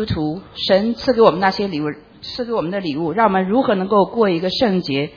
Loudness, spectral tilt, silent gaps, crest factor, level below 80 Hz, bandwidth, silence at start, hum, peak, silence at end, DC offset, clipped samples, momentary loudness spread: -18 LUFS; -7 dB/octave; none; 18 dB; -46 dBFS; 5.4 kHz; 0 s; none; 0 dBFS; 0.05 s; under 0.1%; under 0.1%; 11 LU